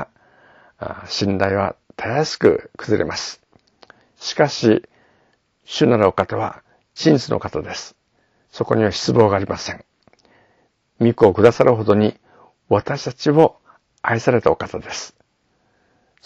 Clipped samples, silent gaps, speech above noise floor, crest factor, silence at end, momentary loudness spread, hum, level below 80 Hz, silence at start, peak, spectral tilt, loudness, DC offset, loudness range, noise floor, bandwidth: under 0.1%; none; 47 dB; 20 dB; 1.2 s; 15 LU; none; -52 dBFS; 0 s; 0 dBFS; -6 dB/octave; -18 LUFS; under 0.1%; 4 LU; -65 dBFS; 8 kHz